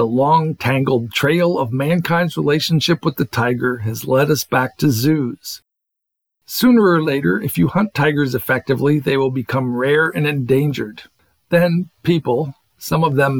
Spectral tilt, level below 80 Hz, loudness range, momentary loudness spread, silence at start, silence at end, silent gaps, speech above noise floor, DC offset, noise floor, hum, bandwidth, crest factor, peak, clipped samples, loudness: -6 dB/octave; -54 dBFS; 2 LU; 7 LU; 0 s; 0 s; none; 63 dB; under 0.1%; -79 dBFS; none; 19 kHz; 14 dB; -2 dBFS; under 0.1%; -17 LUFS